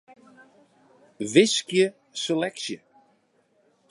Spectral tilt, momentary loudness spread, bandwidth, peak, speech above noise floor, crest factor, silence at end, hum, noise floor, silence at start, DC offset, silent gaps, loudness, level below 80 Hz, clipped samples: -3.5 dB/octave; 15 LU; 11.5 kHz; -4 dBFS; 43 dB; 24 dB; 1.15 s; none; -66 dBFS; 1.2 s; under 0.1%; none; -24 LUFS; -78 dBFS; under 0.1%